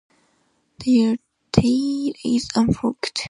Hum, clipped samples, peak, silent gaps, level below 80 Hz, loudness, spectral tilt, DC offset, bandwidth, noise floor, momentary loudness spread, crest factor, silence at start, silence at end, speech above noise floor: none; under 0.1%; 0 dBFS; none; -42 dBFS; -21 LUFS; -6 dB/octave; under 0.1%; 11 kHz; -65 dBFS; 6 LU; 20 dB; 0.8 s; 0 s; 45 dB